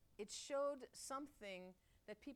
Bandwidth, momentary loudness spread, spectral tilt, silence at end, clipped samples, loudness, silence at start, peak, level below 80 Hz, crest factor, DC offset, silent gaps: 16.5 kHz; 16 LU; -2.5 dB/octave; 0 s; under 0.1%; -49 LUFS; 0.1 s; -34 dBFS; -78 dBFS; 16 dB; under 0.1%; none